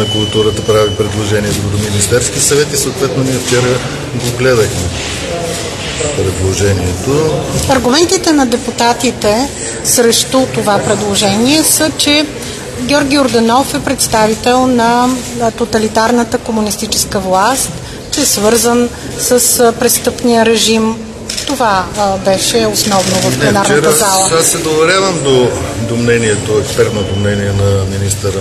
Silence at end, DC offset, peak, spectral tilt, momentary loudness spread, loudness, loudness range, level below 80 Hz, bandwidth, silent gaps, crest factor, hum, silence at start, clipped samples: 0 s; under 0.1%; 0 dBFS; -3.5 dB/octave; 8 LU; -11 LUFS; 3 LU; -34 dBFS; 14 kHz; none; 12 dB; none; 0 s; under 0.1%